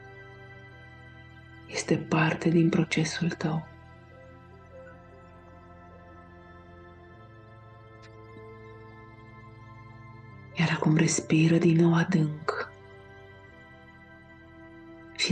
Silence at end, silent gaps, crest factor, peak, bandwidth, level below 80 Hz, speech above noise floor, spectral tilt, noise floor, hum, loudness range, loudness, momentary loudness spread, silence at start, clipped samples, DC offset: 0 s; none; 18 dB; -12 dBFS; 9.6 kHz; -62 dBFS; 27 dB; -5.5 dB/octave; -51 dBFS; none; 24 LU; -26 LUFS; 27 LU; 0 s; under 0.1%; under 0.1%